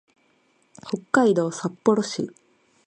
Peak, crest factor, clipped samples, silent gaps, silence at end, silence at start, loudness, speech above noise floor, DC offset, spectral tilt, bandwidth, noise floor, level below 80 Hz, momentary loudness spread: -4 dBFS; 22 dB; under 0.1%; none; 0.6 s; 0.85 s; -23 LUFS; 42 dB; under 0.1%; -5.5 dB/octave; 10 kHz; -64 dBFS; -70 dBFS; 14 LU